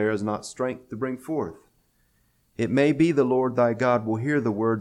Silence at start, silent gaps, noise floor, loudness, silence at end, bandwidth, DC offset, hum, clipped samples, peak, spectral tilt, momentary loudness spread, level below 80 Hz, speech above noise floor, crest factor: 0 s; none; -66 dBFS; -24 LUFS; 0 s; 12 kHz; under 0.1%; none; under 0.1%; -8 dBFS; -7 dB/octave; 11 LU; -62 dBFS; 42 dB; 16 dB